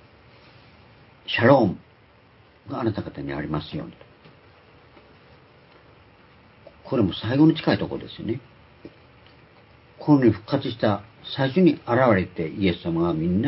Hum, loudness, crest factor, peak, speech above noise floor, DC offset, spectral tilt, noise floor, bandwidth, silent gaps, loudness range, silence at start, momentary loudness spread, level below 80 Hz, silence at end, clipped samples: none; -23 LUFS; 22 dB; -2 dBFS; 33 dB; under 0.1%; -11.5 dB/octave; -54 dBFS; 5.8 kHz; none; 11 LU; 1.3 s; 15 LU; -50 dBFS; 0 s; under 0.1%